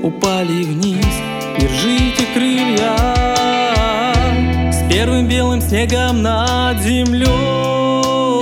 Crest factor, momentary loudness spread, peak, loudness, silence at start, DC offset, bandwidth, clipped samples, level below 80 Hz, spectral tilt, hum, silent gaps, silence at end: 14 dB; 3 LU; 0 dBFS; -15 LUFS; 0 s; under 0.1%; 16.5 kHz; under 0.1%; -24 dBFS; -5 dB/octave; none; none; 0 s